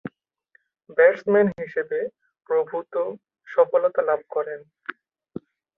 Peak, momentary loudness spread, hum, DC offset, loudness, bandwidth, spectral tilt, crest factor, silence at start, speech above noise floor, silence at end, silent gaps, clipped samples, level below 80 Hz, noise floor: -4 dBFS; 22 LU; none; under 0.1%; -23 LUFS; 5.2 kHz; -8.5 dB/octave; 20 dB; 0.05 s; 42 dB; 0.85 s; none; under 0.1%; -70 dBFS; -64 dBFS